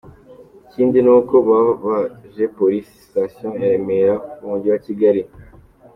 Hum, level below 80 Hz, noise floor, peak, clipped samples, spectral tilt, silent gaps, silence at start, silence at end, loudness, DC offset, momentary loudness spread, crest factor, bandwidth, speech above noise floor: none; -54 dBFS; -45 dBFS; -2 dBFS; under 0.1%; -9.5 dB/octave; none; 0.05 s; 0.5 s; -17 LUFS; under 0.1%; 13 LU; 16 dB; 5.6 kHz; 29 dB